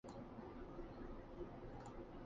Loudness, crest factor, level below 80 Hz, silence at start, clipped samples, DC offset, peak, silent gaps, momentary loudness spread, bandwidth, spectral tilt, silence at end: -55 LUFS; 14 dB; -60 dBFS; 0.05 s; under 0.1%; under 0.1%; -40 dBFS; none; 1 LU; 7.4 kHz; -7 dB/octave; 0 s